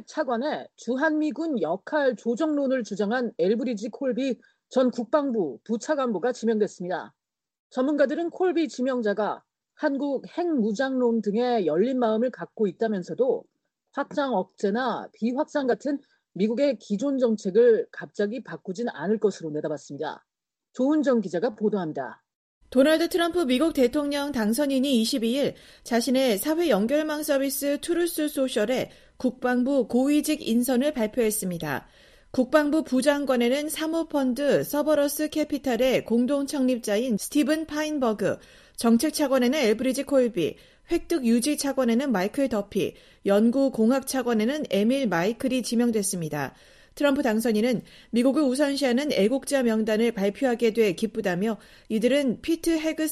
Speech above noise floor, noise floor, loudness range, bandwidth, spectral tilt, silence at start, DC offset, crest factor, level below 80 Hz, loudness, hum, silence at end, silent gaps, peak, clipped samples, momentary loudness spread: 42 dB; -66 dBFS; 3 LU; 14.5 kHz; -4.5 dB/octave; 0.1 s; under 0.1%; 20 dB; -58 dBFS; -25 LUFS; none; 0 s; 7.59-7.70 s, 22.35-22.61 s; -6 dBFS; under 0.1%; 8 LU